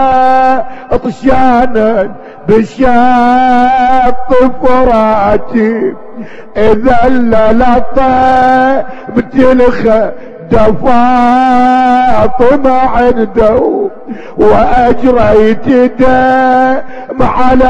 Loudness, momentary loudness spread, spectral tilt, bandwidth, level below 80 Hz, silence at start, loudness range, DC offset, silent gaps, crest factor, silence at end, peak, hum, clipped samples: -8 LUFS; 8 LU; -7.5 dB/octave; 8.2 kHz; -24 dBFS; 0 s; 2 LU; under 0.1%; none; 6 dB; 0 s; 0 dBFS; none; 5%